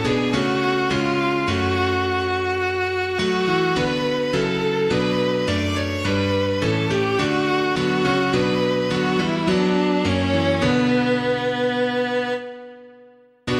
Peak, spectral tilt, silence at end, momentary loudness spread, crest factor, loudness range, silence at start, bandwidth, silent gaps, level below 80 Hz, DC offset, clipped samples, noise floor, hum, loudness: -6 dBFS; -6 dB/octave; 0 s; 3 LU; 14 dB; 1 LU; 0 s; 14 kHz; none; -46 dBFS; under 0.1%; under 0.1%; -50 dBFS; none; -21 LUFS